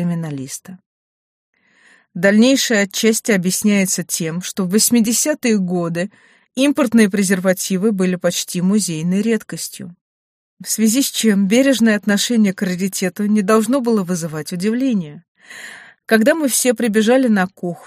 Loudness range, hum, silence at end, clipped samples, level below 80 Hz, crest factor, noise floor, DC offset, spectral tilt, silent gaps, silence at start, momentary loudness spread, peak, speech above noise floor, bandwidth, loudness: 3 LU; none; 0.1 s; under 0.1%; -64 dBFS; 16 dB; -53 dBFS; under 0.1%; -4 dB/octave; 0.86-1.53 s, 10.01-10.57 s, 15.28-15.35 s; 0 s; 14 LU; -2 dBFS; 36 dB; 15.5 kHz; -16 LUFS